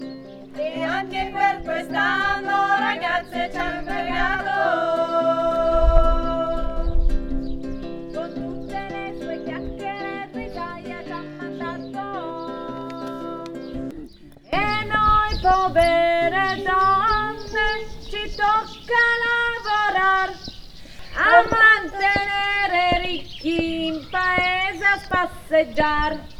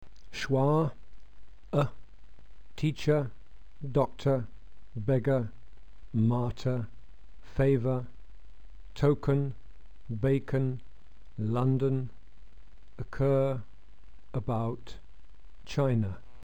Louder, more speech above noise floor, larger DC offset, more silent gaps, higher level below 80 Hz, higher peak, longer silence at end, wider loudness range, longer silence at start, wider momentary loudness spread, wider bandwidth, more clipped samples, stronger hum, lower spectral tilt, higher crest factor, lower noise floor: first, -21 LUFS vs -30 LUFS; second, 21 dB vs 27 dB; second, under 0.1% vs 1%; neither; first, -30 dBFS vs -50 dBFS; first, -2 dBFS vs -14 dBFS; about the same, 0 s vs 0.05 s; first, 13 LU vs 3 LU; second, 0 s vs 0.3 s; second, 14 LU vs 17 LU; first, 12 kHz vs 8.8 kHz; neither; neither; second, -5 dB/octave vs -8.5 dB/octave; about the same, 20 dB vs 18 dB; second, -42 dBFS vs -55 dBFS